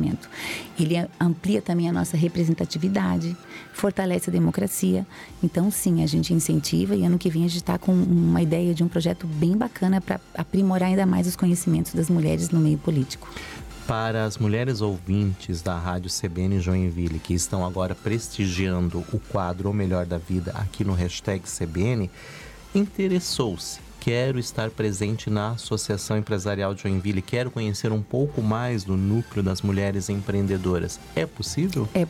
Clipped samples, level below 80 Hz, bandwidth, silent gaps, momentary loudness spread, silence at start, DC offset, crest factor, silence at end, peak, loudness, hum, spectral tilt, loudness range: under 0.1%; -46 dBFS; 15.5 kHz; none; 7 LU; 0 s; under 0.1%; 12 dB; 0 s; -12 dBFS; -24 LUFS; none; -6 dB/octave; 4 LU